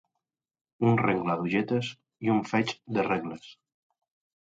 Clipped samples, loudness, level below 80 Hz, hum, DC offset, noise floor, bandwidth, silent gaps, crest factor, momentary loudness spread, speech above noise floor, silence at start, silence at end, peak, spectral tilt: under 0.1%; -28 LUFS; -66 dBFS; none; under 0.1%; -86 dBFS; 7.8 kHz; none; 18 dB; 9 LU; 59 dB; 0.8 s; 0.9 s; -12 dBFS; -7 dB/octave